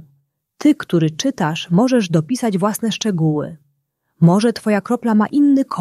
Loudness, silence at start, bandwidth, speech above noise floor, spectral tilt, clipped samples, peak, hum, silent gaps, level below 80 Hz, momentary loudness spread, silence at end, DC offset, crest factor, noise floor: -17 LUFS; 0.6 s; 13.5 kHz; 53 dB; -6 dB/octave; under 0.1%; -2 dBFS; none; none; -60 dBFS; 6 LU; 0 s; under 0.1%; 14 dB; -68 dBFS